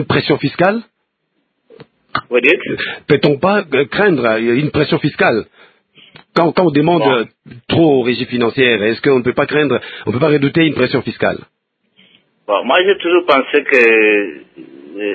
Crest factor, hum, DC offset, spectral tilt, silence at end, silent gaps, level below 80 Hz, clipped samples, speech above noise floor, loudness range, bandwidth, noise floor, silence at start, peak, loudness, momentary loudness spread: 14 dB; none; under 0.1%; -8 dB/octave; 0 s; none; -50 dBFS; under 0.1%; 54 dB; 3 LU; 8 kHz; -68 dBFS; 0 s; 0 dBFS; -13 LUFS; 9 LU